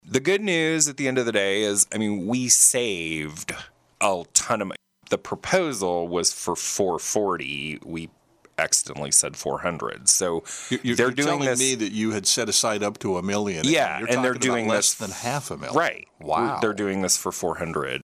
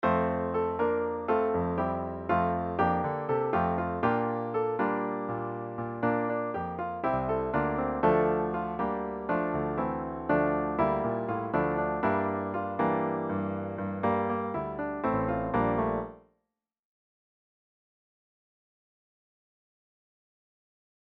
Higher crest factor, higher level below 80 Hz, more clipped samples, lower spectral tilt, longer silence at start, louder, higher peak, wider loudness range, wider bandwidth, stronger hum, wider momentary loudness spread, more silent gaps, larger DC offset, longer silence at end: about the same, 20 dB vs 18 dB; second, -60 dBFS vs -52 dBFS; neither; second, -2.5 dB/octave vs -10.5 dB/octave; about the same, 0.05 s vs 0 s; first, -22 LUFS vs -30 LUFS; first, -4 dBFS vs -12 dBFS; about the same, 4 LU vs 3 LU; first, 16 kHz vs 5.4 kHz; neither; first, 10 LU vs 6 LU; neither; neither; second, 0 s vs 4.85 s